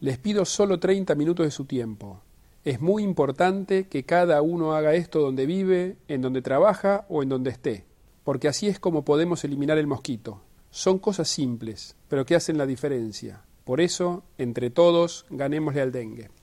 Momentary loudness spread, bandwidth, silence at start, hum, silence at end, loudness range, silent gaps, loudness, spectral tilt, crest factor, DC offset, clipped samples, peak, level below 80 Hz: 13 LU; 13 kHz; 0 s; none; 0.15 s; 4 LU; none; -24 LUFS; -5.5 dB/octave; 18 dB; under 0.1%; under 0.1%; -6 dBFS; -58 dBFS